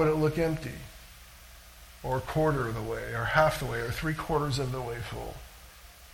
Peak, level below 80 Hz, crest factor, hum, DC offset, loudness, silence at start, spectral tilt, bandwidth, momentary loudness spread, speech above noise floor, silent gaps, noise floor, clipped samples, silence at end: -8 dBFS; -46 dBFS; 22 dB; none; under 0.1%; -30 LUFS; 0 s; -6 dB/octave; 18 kHz; 24 LU; 22 dB; none; -51 dBFS; under 0.1%; 0 s